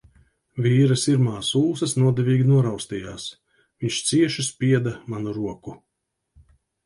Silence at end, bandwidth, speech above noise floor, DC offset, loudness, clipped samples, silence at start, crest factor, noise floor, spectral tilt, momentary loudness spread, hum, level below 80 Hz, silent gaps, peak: 1.1 s; 11.5 kHz; 58 dB; under 0.1%; -22 LUFS; under 0.1%; 0.55 s; 16 dB; -79 dBFS; -5.5 dB/octave; 15 LU; none; -56 dBFS; none; -8 dBFS